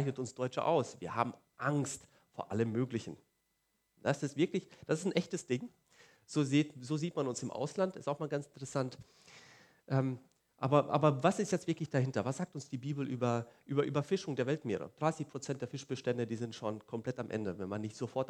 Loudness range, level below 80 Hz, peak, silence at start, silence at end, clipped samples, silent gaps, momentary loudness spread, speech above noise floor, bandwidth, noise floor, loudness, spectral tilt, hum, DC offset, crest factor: 5 LU; -78 dBFS; -12 dBFS; 0 s; 0 s; under 0.1%; none; 9 LU; 45 dB; 12 kHz; -80 dBFS; -36 LUFS; -6 dB/octave; none; under 0.1%; 24 dB